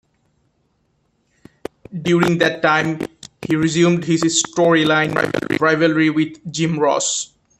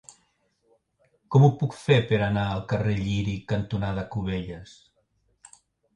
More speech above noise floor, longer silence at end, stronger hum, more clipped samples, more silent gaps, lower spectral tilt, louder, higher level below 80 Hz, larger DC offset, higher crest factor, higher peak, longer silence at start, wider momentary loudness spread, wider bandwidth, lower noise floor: about the same, 48 dB vs 46 dB; second, 0.35 s vs 1.3 s; neither; neither; neither; second, -4.5 dB/octave vs -7.5 dB/octave; first, -17 LUFS vs -25 LUFS; second, -56 dBFS vs -48 dBFS; neither; about the same, 18 dB vs 20 dB; first, 0 dBFS vs -6 dBFS; first, 1.9 s vs 1.3 s; about the same, 13 LU vs 11 LU; first, 13 kHz vs 10.5 kHz; second, -65 dBFS vs -70 dBFS